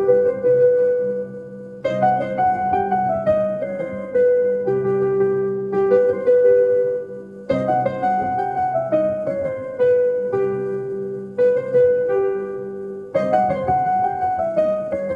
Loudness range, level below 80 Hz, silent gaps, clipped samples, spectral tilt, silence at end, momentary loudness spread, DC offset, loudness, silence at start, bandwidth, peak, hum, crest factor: 3 LU; -52 dBFS; none; under 0.1%; -8.5 dB/octave; 0 s; 11 LU; under 0.1%; -19 LUFS; 0 s; 5 kHz; -4 dBFS; none; 14 dB